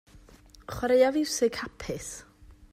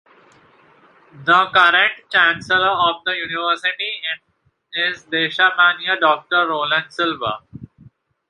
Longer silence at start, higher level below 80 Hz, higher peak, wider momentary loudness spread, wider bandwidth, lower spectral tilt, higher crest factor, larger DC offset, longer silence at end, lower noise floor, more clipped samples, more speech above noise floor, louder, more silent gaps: second, 0.15 s vs 1.15 s; first, -52 dBFS vs -60 dBFS; second, -10 dBFS vs 0 dBFS; first, 19 LU vs 12 LU; first, 15.5 kHz vs 11 kHz; about the same, -3.5 dB/octave vs -3.5 dB/octave; about the same, 18 dB vs 18 dB; neither; second, 0.1 s vs 0.65 s; about the same, -54 dBFS vs -52 dBFS; neither; second, 27 dB vs 34 dB; second, -27 LUFS vs -17 LUFS; neither